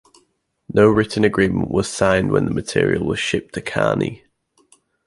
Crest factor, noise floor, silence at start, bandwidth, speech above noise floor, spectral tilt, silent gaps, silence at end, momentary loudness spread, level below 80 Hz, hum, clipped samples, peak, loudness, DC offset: 18 dB; -65 dBFS; 0.7 s; 11.5 kHz; 48 dB; -5.5 dB/octave; none; 0.9 s; 8 LU; -44 dBFS; none; under 0.1%; -2 dBFS; -19 LUFS; under 0.1%